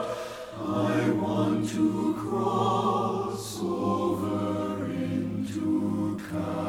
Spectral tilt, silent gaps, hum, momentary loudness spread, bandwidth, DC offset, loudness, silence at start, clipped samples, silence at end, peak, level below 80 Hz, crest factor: -6.5 dB/octave; none; none; 7 LU; 15.5 kHz; under 0.1%; -28 LUFS; 0 s; under 0.1%; 0 s; -14 dBFS; -60 dBFS; 14 dB